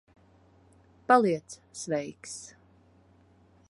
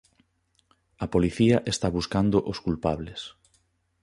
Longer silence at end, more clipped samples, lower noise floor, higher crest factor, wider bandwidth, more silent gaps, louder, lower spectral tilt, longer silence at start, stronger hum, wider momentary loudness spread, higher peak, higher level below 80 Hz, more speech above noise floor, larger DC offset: first, 1.25 s vs 0.75 s; neither; second, -61 dBFS vs -70 dBFS; about the same, 24 dB vs 20 dB; about the same, 11.5 kHz vs 11.5 kHz; neither; second, -28 LUFS vs -25 LUFS; second, -4.5 dB/octave vs -6 dB/octave; about the same, 1.1 s vs 1 s; neither; first, 22 LU vs 15 LU; about the same, -8 dBFS vs -8 dBFS; second, -70 dBFS vs -46 dBFS; second, 33 dB vs 45 dB; neither